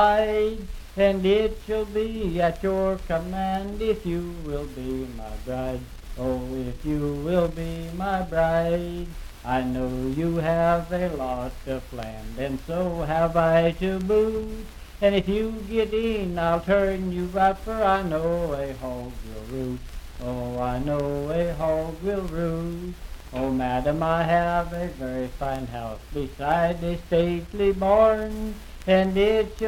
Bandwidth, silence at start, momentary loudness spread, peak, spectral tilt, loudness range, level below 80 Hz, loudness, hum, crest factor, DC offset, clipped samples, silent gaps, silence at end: 17 kHz; 0 s; 12 LU; -6 dBFS; -7 dB/octave; 5 LU; -38 dBFS; -25 LUFS; none; 18 dB; under 0.1%; under 0.1%; none; 0 s